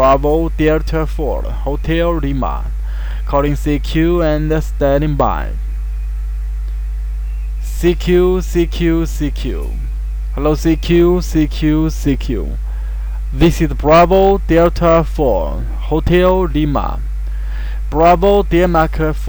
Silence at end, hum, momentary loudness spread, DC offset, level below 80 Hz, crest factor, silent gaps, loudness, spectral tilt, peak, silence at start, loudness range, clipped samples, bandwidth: 0 s; none; 12 LU; under 0.1%; -18 dBFS; 10 dB; none; -15 LUFS; -7 dB/octave; -4 dBFS; 0 s; 5 LU; under 0.1%; over 20 kHz